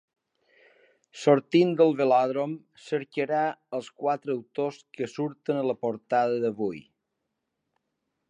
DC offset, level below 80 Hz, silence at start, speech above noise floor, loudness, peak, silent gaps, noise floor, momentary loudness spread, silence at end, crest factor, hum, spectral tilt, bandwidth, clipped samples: under 0.1%; -78 dBFS; 1.15 s; 55 dB; -27 LUFS; -6 dBFS; none; -82 dBFS; 13 LU; 1.5 s; 22 dB; none; -6.5 dB/octave; 10 kHz; under 0.1%